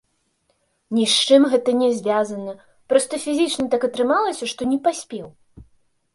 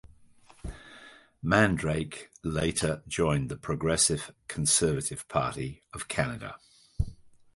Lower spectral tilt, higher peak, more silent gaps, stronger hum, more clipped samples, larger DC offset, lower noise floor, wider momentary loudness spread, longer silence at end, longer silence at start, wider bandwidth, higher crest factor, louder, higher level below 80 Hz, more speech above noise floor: about the same, -3 dB/octave vs -4 dB/octave; first, -2 dBFS vs -6 dBFS; neither; neither; neither; neither; first, -67 dBFS vs -57 dBFS; second, 14 LU vs 19 LU; first, 0.5 s vs 0.25 s; first, 0.9 s vs 0.65 s; about the same, 11.5 kHz vs 12 kHz; second, 18 dB vs 24 dB; first, -19 LUFS vs -29 LUFS; second, -60 dBFS vs -46 dBFS; first, 48 dB vs 28 dB